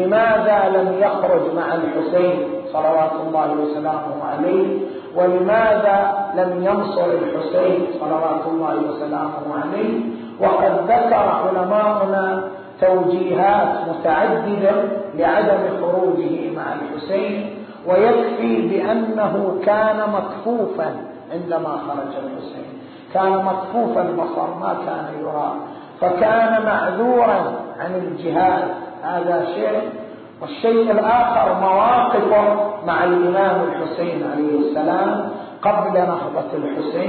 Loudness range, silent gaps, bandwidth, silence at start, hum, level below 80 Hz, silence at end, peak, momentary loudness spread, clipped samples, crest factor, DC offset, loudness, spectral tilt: 5 LU; none; 4.6 kHz; 0 s; none; -58 dBFS; 0 s; -6 dBFS; 10 LU; under 0.1%; 12 dB; under 0.1%; -18 LUFS; -11.5 dB/octave